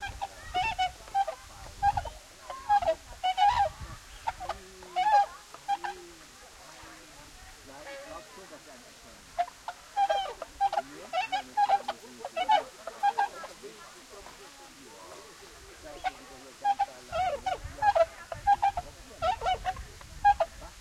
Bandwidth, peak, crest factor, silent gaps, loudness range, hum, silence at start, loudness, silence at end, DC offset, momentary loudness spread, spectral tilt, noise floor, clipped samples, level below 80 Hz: 14.5 kHz; -12 dBFS; 20 dB; none; 12 LU; none; 0 s; -30 LUFS; 0 s; under 0.1%; 22 LU; -2.5 dB/octave; -51 dBFS; under 0.1%; -52 dBFS